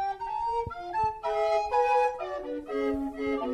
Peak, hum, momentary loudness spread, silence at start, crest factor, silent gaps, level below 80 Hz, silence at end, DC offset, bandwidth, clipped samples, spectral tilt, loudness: -14 dBFS; none; 9 LU; 0 s; 14 dB; none; -54 dBFS; 0 s; under 0.1%; 12.5 kHz; under 0.1%; -5.5 dB/octave; -29 LUFS